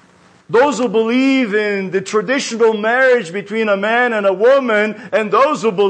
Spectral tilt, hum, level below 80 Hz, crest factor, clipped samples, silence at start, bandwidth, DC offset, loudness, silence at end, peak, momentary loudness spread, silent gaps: -4.5 dB/octave; none; -68 dBFS; 12 dB; under 0.1%; 0.5 s; 9.2 kHz; under 0.1%; -15 LUFS; 0 s; -4 dBFS; 6 LU; none